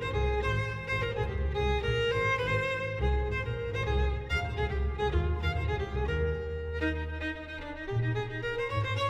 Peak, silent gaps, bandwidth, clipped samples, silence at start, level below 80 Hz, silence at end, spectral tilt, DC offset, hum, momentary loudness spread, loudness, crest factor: -16 dBFS; none; 9 kHz; under 0.1%; 0 s; -36 dBFS; 0 s; -6.5 dB/octave; under 0.1%; none; 6 LU; -31 LUFS; 14 dB